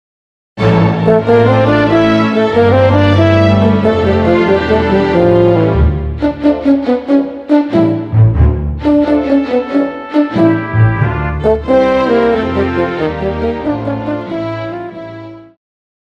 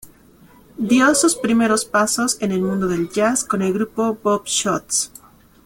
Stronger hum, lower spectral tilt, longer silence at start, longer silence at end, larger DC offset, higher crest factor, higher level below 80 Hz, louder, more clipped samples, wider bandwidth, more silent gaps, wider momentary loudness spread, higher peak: neither; first, -8.5 dB/octave vs -3.5 dB/octave; first, 0.55 s vs 0.05 s; about the same, 0.6 s vs 0.6 s; neither; about the same, 12 dB vs 16 dB; first, -26 dBFS vs -54 dBFS; first, -12 LUFS vs -18 LUFS; neither; second, 7.2 kHz vs 17 kHz; neither; about the same, 8 LU vs 6 LU; first, 0 dBFS vs -4 dBFS